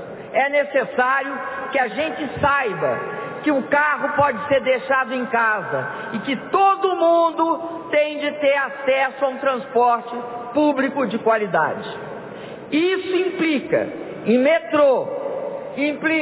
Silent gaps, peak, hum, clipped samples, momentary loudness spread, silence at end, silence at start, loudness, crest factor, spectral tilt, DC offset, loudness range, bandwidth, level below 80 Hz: none; -6 dBFS; none; under 0.1%; 10 LU; 0 s; 0 s; -20 LUFS; 14 dB; -9 dB/octave; under 0.1%; 2 LU; 4 kHz; -56 dBFS